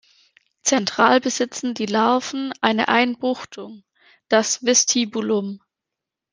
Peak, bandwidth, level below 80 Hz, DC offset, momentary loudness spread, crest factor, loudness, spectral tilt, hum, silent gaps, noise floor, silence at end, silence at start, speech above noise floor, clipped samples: -2 dBFS; 10.5 kHz; -68 dBFS; under 0.1%; 14 LU; 20 dB; -20 LUFS; -2 dB/octave; none; none; -85 dBFS; 0.75 s; 0.65 s; 65 dB; under 0.1%